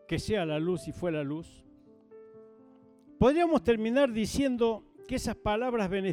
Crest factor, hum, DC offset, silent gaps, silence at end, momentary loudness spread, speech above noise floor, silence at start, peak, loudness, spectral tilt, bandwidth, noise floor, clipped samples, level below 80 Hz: 18 dB; none; under 0.1%; none; 0 s; 9 LU; 29 dB; 0.1 s; -12 dBFS; -29 LUFS; -6 dB/octave; 16 kHz; -57 dBFS; under 0.1%; -50 dBFS